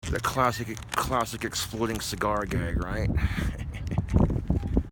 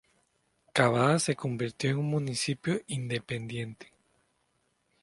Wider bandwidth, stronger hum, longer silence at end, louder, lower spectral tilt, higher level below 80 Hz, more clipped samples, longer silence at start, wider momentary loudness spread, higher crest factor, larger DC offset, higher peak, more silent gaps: first, 17.5 kHz vs 11.5 kHz; neither; second, 0 s vs 1.2 s; about the same, -28 LUFS vs -30 LUFS; about the same, -5.5 dB/octave vs -5 dB/octave; first, -34 dBFS vs -66 dBFS; neither; second, 0.05 s vs 0.75 s; second, 6 LU vs 11 LU; about the same, 20 dB vs 24 dB; neither; about the same, -8 dBFS vs -8 dBFS; neither